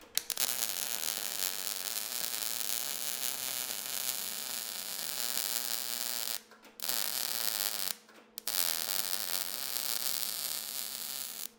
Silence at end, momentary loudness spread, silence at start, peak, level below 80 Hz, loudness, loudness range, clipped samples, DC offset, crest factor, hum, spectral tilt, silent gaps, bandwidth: 0.05 s; 6 LU; 0 s; -2 dBFS; -80 dBFS; -33 LUFS; 2 LU; under 0.1%; under 0.1%; 34 dB; none; 1.5 dB/octave; none; 19 kHz